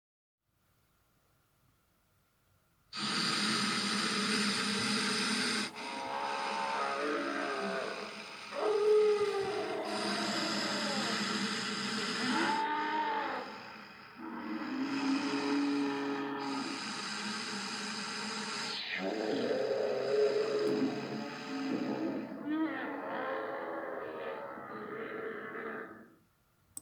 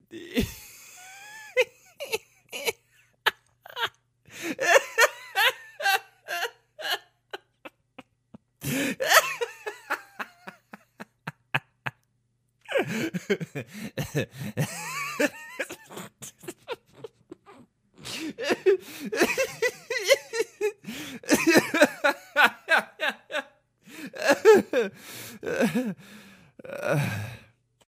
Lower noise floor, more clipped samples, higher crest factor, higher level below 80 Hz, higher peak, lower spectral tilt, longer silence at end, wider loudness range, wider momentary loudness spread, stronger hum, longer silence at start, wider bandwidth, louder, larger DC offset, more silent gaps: about the same, -74 dBFS vs -72 dBFS; neither; second, 16 dB vs 26 dB; second, -80 dBFS vs -58 dBFS; second, -18 dBFS vs -2 dBFS; about the same, -3 dB/octave vs -3.5 dB/octave; second, 0 s vs 0.5 s; second, 7 LU vs 10 LU; second, 11 LU vs 22 LU; neither; first, 2.95 s vs 0.1 s; first, 19 kHz vs 15.5 kHz; second, -34 LUFS vs -26 LUFS; neither; neither